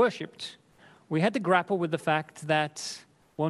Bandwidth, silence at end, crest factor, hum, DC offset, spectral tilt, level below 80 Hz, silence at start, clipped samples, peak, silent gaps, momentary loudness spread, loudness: 12.5 kHz; 0 s; 20 dB; none; under 0.1%; -5 dB/octave; -74 dBFS; 0 s; under 0.1%; -8 dBFS; none; 15 LU; -28 LUFS